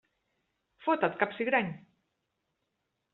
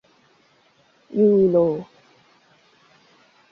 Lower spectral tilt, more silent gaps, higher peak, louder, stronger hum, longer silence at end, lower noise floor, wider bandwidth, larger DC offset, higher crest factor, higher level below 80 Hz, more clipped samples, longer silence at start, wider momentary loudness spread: second, -3.5 dB/octave vs -10.5 dB/octave; neither; second, -12 dBFS vs -8 dBFS; second, -30 LUFS vs -19 LUFS; neither; second, 1.35 s vs 1.7 s; first, -82 dBFS vs -59 dBFS; second, 4.3 kHz vs 5.8 kHz; neither; first, 22 dB vs 16 dB; second, -78 dBFS vs -64 dBFS; neither; second, 0.8 s vs 1.15 s; second, 10 LU vs 14 LU